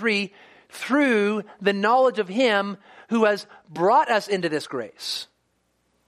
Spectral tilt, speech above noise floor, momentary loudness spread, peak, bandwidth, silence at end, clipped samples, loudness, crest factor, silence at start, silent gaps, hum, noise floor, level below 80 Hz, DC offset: -4.5 dB/octave; 47 dB; 14 LU; -6 dBFS; 14.5 kHz; 0.85 s; under 0.1%; -22 LUFS; 18 dB; 0 s; none; none; -70 dBFS; -76 dBFS; under 0.1%